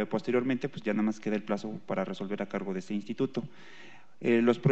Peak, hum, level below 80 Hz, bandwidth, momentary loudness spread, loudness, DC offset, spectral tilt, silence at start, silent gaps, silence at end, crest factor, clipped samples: -12 dBFS; none; -82 dBFS; 8.2 kHz; 12 LU; -31 LUFS; 0.5%; -7.5 dB/octave; 0 s; none; 0 s; 20 dB; under 0.1%